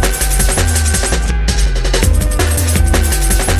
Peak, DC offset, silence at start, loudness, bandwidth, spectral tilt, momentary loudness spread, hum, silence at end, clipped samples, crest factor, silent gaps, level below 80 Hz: 0 dBFS; under 0.1%; 0 s; -14 LUFS; 16 kHz; -3.5 dB/octave; 3 LU; none; 0 s; under 0.1%; 12 dB; none; -14 dBFS